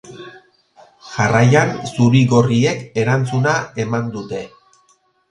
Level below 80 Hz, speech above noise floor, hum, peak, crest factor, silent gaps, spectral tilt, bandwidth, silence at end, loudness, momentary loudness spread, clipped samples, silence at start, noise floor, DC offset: -52 dBFS; 43 dB; none; 0 dBFS; 18 dB; none; -6.5 dB/octave; 10.5 kHz; 0.85 s; -16 LUFS; 17 LU; under 0.1%; 0.05 s; -58 dBFS; under 0.1%